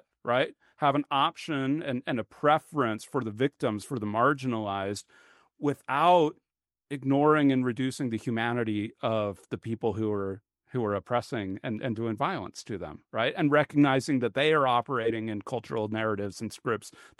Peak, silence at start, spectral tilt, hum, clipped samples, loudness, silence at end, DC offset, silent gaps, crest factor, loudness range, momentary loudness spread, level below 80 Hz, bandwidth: -8 dBFS; 0.25 s; -6 dB/octave; none; under 0.1%; -28 LUFS; 0.2 s; under 0.1%; none; 20 dB; 5 LU; 11 LU; -68 dBFS; 12 kHz